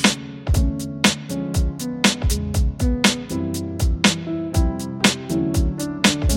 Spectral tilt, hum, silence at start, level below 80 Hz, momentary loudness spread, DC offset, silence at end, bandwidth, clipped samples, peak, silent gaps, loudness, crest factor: -4 dB/octave; none; 0 s; -26 dBFS; 7 LU; under 0.1%; 0 s; 17 kHz; under 0.1%; -2 dBFS; none; -21 LUFS; 20 dB